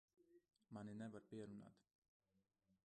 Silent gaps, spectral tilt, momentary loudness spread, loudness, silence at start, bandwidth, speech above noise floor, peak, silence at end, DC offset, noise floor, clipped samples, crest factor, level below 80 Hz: 1.95-2.02 s, 2.08-2.20 s; -7 dB/octave; 8 LU; -57 LUFS; 0.2 s; 9.4 kHz; 32 dB; -44 dBFS; 0.15 s; under 0.1%; -88 dBFS; under 0.1%; 16 dB; -88 dBFS